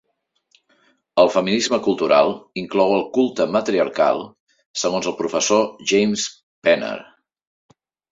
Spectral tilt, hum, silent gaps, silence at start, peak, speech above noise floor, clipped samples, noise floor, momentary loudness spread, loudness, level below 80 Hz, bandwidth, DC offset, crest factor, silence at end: -3.5 dB/octave; none; 4.40-4.47 s, 4.66-4.74 s, 6.43-6.62 s; 1.15 s; -2 dBFS; 51 dB; under 0.1%; -70 dBFS; 10 LU; -19 LUFS; -62 dBFS; 7.8 kHz; under 0.1%; 18 dB; 1.1 s